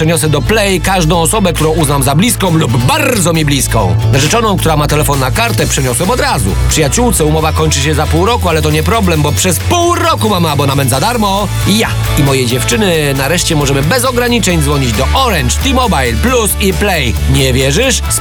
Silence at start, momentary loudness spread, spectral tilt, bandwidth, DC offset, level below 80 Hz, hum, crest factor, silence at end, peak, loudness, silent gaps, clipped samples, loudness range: 0 s; 2 LU; -4.5 dB/octave; over 20 kHz; under 0.1%; -20 dBFS; none; 10 dB; 0 s; 0 dBFS; -10 LUFS; none; under 0.1%; 1 LU